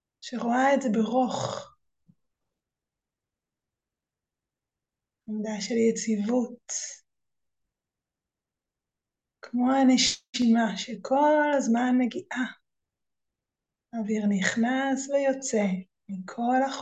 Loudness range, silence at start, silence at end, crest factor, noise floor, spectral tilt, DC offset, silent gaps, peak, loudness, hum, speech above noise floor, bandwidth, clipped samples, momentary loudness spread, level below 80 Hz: 11 LU; 0.25 s; 0 s; 18 dB; -90 dBFS; -4 dB/octave; under 0.1%; 10.29-10.33 s; -10 dBFS; -26 LUFS; none; 64 dB; 9 kHz; under 0.1%; 13 LU; -72 dBFS